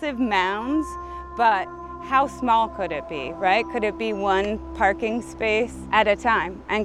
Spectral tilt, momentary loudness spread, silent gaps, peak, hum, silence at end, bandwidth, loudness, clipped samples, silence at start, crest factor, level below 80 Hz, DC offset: -5 dB/octave; 9 LU; none; -4 dBFS; none; 0 s; 12.5 kHz; -23 LUFS; under 0.1%; 0 s; 20 dB; -44 dBFS; under 0.1%